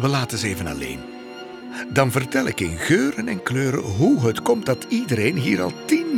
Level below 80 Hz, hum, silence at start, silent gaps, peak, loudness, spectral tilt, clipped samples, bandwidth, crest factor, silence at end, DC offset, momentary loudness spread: -48 dBFS; none; 0 s; none; -4 dBFS; -21 LUFS; -5.5 dB/octave; under 0.1%; 18.5 kHz; 18 dB; 0 s; under 0.1%; 14 LU